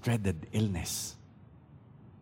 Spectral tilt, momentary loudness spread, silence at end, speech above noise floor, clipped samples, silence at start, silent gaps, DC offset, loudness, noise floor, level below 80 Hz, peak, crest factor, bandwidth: -5 dB/octave; 23 LU; 0 s; 24 dB; under 0.1%; 0 s; none; under 0.1%; -33 LUFS; -55 dBFS; -54 dBFS; -18 dBFS; 18 dB; 16.5 kHz